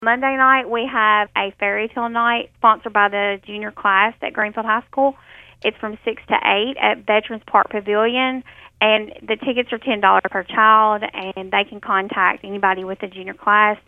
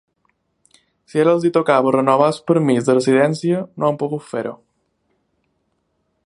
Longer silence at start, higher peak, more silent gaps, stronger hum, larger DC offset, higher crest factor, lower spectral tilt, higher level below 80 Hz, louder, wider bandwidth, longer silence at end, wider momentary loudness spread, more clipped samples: second, 0 s vs 1.15 s; about the same, 0 dBFS vs 0 dBFS; neither; neither; neither; about the same, 18 dB vs 18 dB; about the same, -6 dB/octave vs -6.5 dB/octave; first, -58 dBFS vs -66 dBFS; about the same, -18 LUFS vs -17 LUFS; second, 4.7 kHz vs 11.5 kHz; second, 0.1 s vs 1.7 s; about the same, 10 LU vs 10 LU; neither